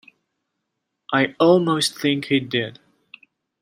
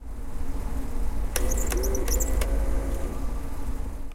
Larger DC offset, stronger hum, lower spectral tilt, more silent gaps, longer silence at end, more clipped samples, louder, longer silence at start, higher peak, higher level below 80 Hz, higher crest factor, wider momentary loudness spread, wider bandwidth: neither; neither; about the same, -4.5 dB/octave vs -4.5 dB/octave; neither; first, 0.9 s vs 0 s; neither; first, -20 LUFS vs -30 LUFS; first, 1.1 s vs 0 s; first, -4 dBFS vs -8 dBFS; second, -68 dBFS vs -28 dBFS; about the same, 18 dB vs 18 dB; about the same, 9 LU vs 9 LU; about the same, 16 kHz vs 16.5 kHz